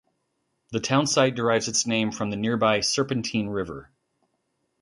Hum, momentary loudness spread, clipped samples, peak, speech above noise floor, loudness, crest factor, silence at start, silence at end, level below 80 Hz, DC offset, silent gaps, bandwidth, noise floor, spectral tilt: none; 10 LU; under 0.1%; -6 dBFS; 51 dB; -24 LUFS; 20 dB; 0.7 s; 1 s; -58 dBFS; under 0.1%; none; 11.5 kHz; -75 dBFS; -3.5 dB/octave